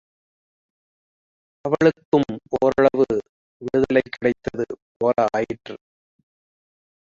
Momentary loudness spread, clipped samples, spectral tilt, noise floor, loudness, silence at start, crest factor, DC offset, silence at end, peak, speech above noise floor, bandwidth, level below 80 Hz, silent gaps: 14 LU; under 0.1%; -7 dB/octave; under -90 dBFS; -21 LUFS; 1.65 s; 20 dB; under 0.1%; 1.3 s; -2 dBFS; over 69 dB; 7.4 kHz; -54 dBFS; 2.05-2.12 s, 3.29-3.60 s, 4.82-5.00 s